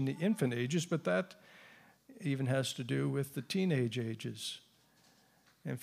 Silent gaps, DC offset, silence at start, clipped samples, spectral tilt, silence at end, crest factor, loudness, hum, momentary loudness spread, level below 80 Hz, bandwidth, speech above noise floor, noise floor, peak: none; under 0.1%; 0 s; under 0.1%; -5.5 dB/octave; 0 s; 16 dB; -35 LUFS; none; 13 LU; -82 dBFS; 15.5 kHz; 33 dB; -68 dBFS; -20 dBFS